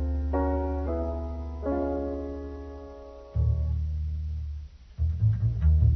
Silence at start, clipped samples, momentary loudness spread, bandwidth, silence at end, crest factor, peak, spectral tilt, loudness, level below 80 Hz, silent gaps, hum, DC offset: 0 s; under 0.1%; 16 LU; 2.5 kHz; 0 s; 16 dB; -12 dBFS; -11 dB/octave; -30 LUFS; -30 dBFS; none; none; under 0.1%